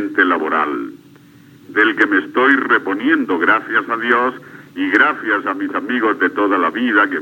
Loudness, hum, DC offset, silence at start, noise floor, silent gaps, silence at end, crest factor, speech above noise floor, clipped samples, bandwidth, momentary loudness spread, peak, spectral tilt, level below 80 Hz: -16 LUFS; none; under 0.1%; 0 s; -44 dBFS; none; 0 s; 16 dB; 29 dB; under 0.1%; 17 kHz; 8 LU; 0 dBFS; -5.5 dB/octave; -72 dBFS